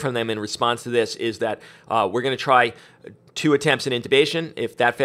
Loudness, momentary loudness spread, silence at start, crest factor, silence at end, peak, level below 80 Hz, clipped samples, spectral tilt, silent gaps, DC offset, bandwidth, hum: -21 LUFS; 9 LU; 0 s; 20 dB; 0 s; -2 dBFS; -66 dBFS; under 0.1%; -4.5 dB/octave; none; under 0.1%; 15 kHz; none